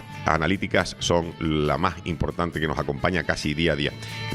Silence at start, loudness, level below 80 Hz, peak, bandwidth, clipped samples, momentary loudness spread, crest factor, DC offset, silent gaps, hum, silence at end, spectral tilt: 0 s; -25 LUFS; -42 dBFS; -2 dBFS; 15 kHz; under 0.1%; 4 LU; 22 dB; under 0.1%; none; none; 0 s; -5 dB/octave